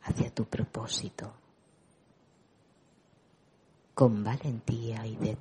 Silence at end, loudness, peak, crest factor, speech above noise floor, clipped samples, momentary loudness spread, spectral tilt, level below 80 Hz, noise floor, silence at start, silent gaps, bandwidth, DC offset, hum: 0 s; -32 LUFS; -8 dBFS; 26 dB; 35 dB; under 0.1%; 16 LU; -6 dB/octave; -56 dBFS; -65 dBFS; 0 s; none; 10.5 kHz; under 0.1%; none